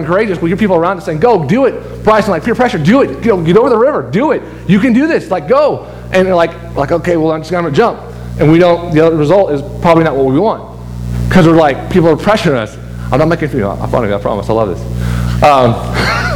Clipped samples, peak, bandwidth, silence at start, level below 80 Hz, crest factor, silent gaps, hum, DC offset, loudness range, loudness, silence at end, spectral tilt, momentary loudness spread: 0.5%; 0 dBFS; 16.5 kHz; 0 s; -28 dBFS; 10 dB; none; 60 Hz at -30 dBFS; under 0.1%; 2 LU; -11 LUFS; 0 s; -7 dB/octave; 8 LU